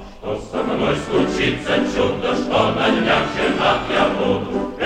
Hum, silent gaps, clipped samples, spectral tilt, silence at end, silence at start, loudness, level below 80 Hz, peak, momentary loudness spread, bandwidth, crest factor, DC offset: none; none; under 0.1%; -5.5 dB/octave; 0 s; 0 s; -19 LUFS; -40 dBFS; -2 dBFS; 7 LU; 11.5 kHz; 18 dB; under 0.1%